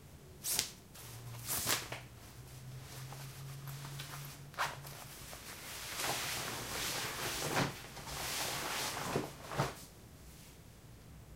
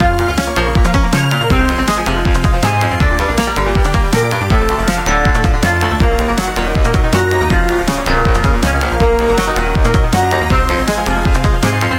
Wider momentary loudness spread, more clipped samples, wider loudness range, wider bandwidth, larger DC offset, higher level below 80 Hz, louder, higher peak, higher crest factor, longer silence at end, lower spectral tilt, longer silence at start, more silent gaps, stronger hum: first, 19 LU vs 2 LU; neither; first, 8 LU vs 0 LU; about the same, 16 kHz vs 17 kHz; neither; second, -60 dBFS vs -16 dBFS; second, -39 LUFS vs -14 LUFS; second, -6 dBFS vs 0 dBFS; first, 36 dB vs 12 dB; about the same, 0 s vs 0 s; second, -2.5 dB/octave vs -5.5 dB/octave; about the same, 0 s vs 0 s; neither; neither